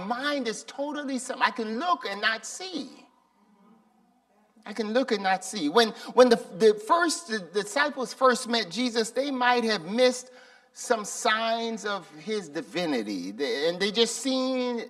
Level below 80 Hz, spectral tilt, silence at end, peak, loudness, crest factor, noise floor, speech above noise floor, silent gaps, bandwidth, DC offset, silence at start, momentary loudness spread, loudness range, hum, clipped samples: -78 dBFS; -3 dB/octave; 0 s; -4 dBFS; -26 LUFS; 22 dB; -65 dBFS; 38 dB; none; 14 kHz; under 0.1%; 0 s; 11 LU; 8 LU; none; under 0.1%